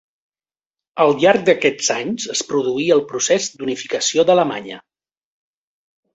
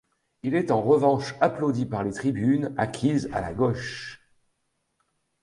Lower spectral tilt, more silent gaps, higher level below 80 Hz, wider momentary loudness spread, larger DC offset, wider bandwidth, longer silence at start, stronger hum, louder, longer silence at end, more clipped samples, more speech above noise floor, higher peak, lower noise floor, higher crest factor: second, -3 dB/octave vs -7 dB/octave; neither; second, -62 dBFS vs -54 dBFS; about the same, 11 LU vs 11 LU; neither; second, 8.2 kHz vs 11.5 kHz; first, 0.95 s vs 0.45 s; neither; first, -17 LUFS vs -25 LUFS; about the same, 1.35 s vs 1.25 s; neither; first, over 73 dB vs 51 dB; first, -2 dBFS vs -6 dBFS; first, under -90 dBFS vs -75 dBFS; about the same, 18 dB vs 20 dB